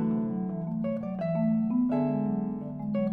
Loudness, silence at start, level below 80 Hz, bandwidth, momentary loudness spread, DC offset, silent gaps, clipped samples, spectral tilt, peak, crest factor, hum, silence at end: -29 LUFS; 0 s; -60 dBFS; 4.2 kHz; 6 LU; under 0.1%; none; under 0.1%; -12 dB/octave; -18 dBFS; 10 dB; none; 0 s